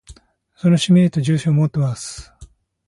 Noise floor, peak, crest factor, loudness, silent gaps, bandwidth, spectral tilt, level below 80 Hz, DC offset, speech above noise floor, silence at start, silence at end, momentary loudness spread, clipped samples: -46 dBFS; -4 dBFS; 14 dB; -17 LUFS; none; 11.5 kHz; -6.5 dB/octave; -48 dBFS; under 0.1%; 30 dB; 0.1 s; 0.4 s; 16 LU; under 0.1%